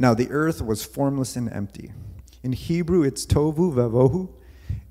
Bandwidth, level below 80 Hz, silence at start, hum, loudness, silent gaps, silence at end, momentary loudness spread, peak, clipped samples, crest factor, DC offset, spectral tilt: 16 kHz; -40 dBFS; 0 s; none; -23 LUFS; none; 0.05 s; 16 LU; -4 dBFS; under 0.1%; 20 dB; under 0.1%; -6.5 dB/octave